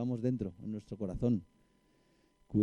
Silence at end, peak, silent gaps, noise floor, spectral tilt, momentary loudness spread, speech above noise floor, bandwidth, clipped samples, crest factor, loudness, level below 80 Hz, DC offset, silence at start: 0 s; -18 dBFS; none; -70 dBFS; -10 dB/octave; 8 LU; 35 dB; 9.6 kHz; under 0.1%; 20 dB; -37 LUFS; -56 dBFS; under 0.1%; 0 s